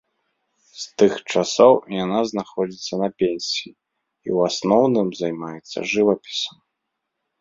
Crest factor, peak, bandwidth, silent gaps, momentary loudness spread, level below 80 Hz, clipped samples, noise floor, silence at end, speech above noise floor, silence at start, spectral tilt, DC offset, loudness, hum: 20 dB; -2 dBFS; 7.8 kHz; none; 15 LU; -64 dBFS; under 0.1%; -79 dBFS; 0.9 s; 59 dB; 0.75 s; -4.5 dB/octave; under 0.1%; -20 LUFS; none